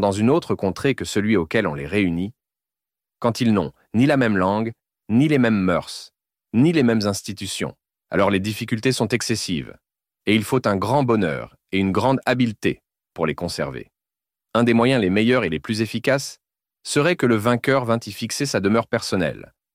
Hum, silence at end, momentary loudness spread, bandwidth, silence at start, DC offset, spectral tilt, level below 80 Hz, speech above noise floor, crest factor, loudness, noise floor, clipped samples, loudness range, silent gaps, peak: none; 0.3 s; 10 LU; 16 kHz; 0 s; under 0.1%; -5.5 dB/octave; -52 dBFS; 70 dB; 16 dB; -21 LUFS; -90 dBFS; under 0.1%; 3 LU; none; -4 dBFS